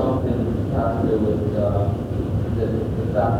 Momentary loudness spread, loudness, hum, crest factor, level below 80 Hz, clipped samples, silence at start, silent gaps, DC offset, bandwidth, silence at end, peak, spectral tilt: 3 LU; -22 LUFS; none; 14 dB; -34 dBFS; under 0.1%; 0 s; none; under 0.1%; 9 kHz; 0 s; -6 dBFS; -9.5 dB/octave